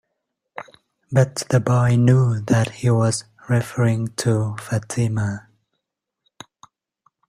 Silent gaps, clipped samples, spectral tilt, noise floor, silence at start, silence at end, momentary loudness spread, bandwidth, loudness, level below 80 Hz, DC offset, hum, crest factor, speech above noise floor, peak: none; under 0.1%; -6.5 dB/octave; -80 dBFS; 0.55 s; 1.9 s; 12 LU; 13 kHz; -20 LUFS; -52 dBFS; under 0.1%; none; 18 dB; 62 dB; -2 dBFS